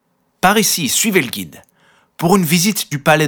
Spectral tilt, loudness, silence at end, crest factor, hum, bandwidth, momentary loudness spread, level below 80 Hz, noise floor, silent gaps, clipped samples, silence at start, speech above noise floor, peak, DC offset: -3.5 dB/octave; -14 LUFS; 0 s; 16 dB; none; over 20 kHz; 10 LU; -52 dBFS; -45 dBFS; none; under 0.1%; 0.45 s; 30 dB; 0 dBFS; under 0.1%